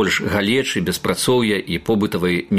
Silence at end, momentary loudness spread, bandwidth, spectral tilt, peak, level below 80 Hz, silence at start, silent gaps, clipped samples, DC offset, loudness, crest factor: 0 s; 4 LU; 15.5 kHz; -4.5 dB/octave; -2 dBFS; -46 dBFS; 0 s; none; under 0.1%; under 0.1%; -19 LUFS; 16 dB